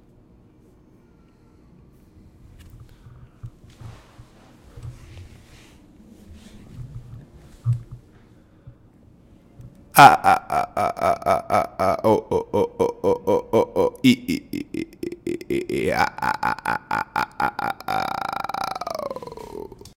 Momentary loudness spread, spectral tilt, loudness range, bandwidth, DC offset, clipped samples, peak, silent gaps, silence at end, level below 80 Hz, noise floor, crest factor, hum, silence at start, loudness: 24 LU; -5 dB/octave; 17 LU; 17 kHz; under 0.1%; under 0.1%; 0 dBFS; none; 0.1 s; -50 dBFS; -53 dBFS; 24 dB; none; 2.75 s; -21 LUFS